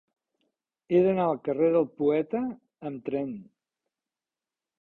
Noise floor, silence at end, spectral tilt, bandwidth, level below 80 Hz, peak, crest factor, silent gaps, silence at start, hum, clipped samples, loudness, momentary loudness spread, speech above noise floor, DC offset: under -90 dBFS; 1.4 s; -10.5 dB/octave; 4.2 kHz; -68 dBFS; -12 dBFS; 18 dB; none; 0.9 s; none; under 0.1%; -27 LUFS; 14 LU; over 64 dB; under 0.1%